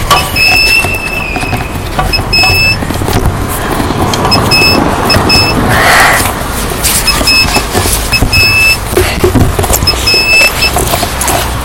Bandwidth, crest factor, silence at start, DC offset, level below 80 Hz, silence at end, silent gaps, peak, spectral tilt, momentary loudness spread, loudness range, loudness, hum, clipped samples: over 20 kHz; 8 dB; 0 s; 0.2%; -18 dBFS; 0 s; none; 0 dBFS; -3 dB/octave; 9 LU; 3 LU; -7 LUFS; none; 0.7%